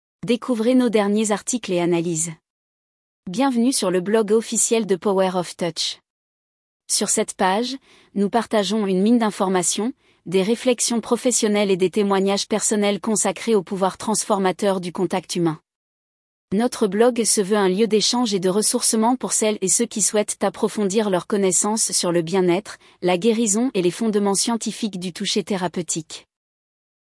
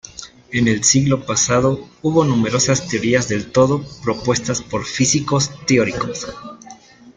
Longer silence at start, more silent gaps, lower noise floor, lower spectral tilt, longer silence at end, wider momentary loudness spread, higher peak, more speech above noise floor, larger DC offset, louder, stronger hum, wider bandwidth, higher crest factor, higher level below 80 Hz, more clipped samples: about the same, 0.25 s vs 0.15 s; first, 2.50-3.23 s, 6.10-6.80 s, 15.76-16.48 s vs none; first, under -90 dBFS vs -42 dBFS; about the same, -3.5 dB/octave vs -4 dB/octave; first, 0.95 s vs 0.05 s; second, 7 LU vs 10 LU; second, -4 dBFS vs 0 dBFS; first, over 70 dB vs 24 dB; neither; second, -20 LUFS vs -17 LUFS; neither; first, 12 kHz vs 10 kHz; about the same, 16 dB vs 18 dB; second, -66 dBFS vs -46 dBFS; neither